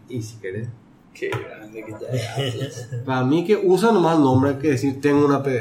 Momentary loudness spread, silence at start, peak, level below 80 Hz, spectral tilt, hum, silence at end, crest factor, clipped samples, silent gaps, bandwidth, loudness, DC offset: 16 LU; 0.1 s; -6 dBFS; -58 dBFS; -7 dB/octave; none; 0 s; 16 dB; under 0.1%; none; 15.5 kHz; -20 LUFS; under 0.1%